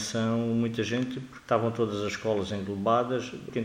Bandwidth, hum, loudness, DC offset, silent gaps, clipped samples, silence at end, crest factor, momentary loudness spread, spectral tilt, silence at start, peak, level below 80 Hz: 15 kHz; none; -29 LUFS; under 0.1%; none; under 0.1%; 0 s; 18 dB; 7 LU; -5.5 dB/octave; 0 s; -10 dBFS; -62 dBFS